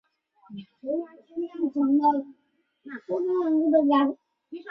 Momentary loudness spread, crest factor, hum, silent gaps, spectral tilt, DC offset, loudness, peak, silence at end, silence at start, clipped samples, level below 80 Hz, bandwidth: 23 LU; 16 dB; none; none; -8 dB/octave; under 0.1%; -25 LUFS; -10 dBFS; 0 s; 0.5 s; under 0.1%; -74 dBFS; 5.4 kHz